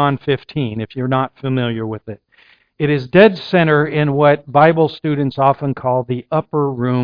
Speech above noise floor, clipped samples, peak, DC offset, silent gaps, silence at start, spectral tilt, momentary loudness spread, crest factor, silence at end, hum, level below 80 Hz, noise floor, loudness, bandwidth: 36 dB; under 0.1%; 0 dBFS; under 0.1%; none; 0 s; -9.5 dB/octave; 11 LU; 16 dB; 0 s; none; -52 dBFS; -52 dBFS; -16 LUFS; 5.2 kHz